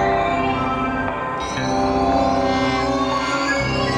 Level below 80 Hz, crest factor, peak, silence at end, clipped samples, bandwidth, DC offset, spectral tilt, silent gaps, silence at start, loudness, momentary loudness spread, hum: -36 dBFS; 12 dB; -8 dBFS; 0 s; under 0.1%; 11 kHz; under 0.1%; -5 dB/octave; none; 0 s; -20 LUFS; 5 LU; none